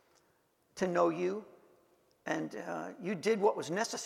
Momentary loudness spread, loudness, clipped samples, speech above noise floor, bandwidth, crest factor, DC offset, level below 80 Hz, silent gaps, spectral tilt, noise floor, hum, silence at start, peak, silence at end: 12 LU; -34 LUFS; under 0.1%; 39 dB; 15.5 kHz; 20 dB; under 0.1%; -78 dBFS; none; -4.5 dB/octave; -73 dBFS; none; 0.75 s; -16 dBFS; 0 s